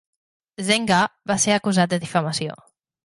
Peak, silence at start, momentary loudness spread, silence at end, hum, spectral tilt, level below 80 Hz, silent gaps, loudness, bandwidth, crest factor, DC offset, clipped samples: -4 dBFS; 0.6 s; 9 LU; 0.5 s; none; -3.5 dB/octave; -60 dBFS; none; -21 LUFS; 11.5 kHz; 18 dB; under 0.1%; under 0.1%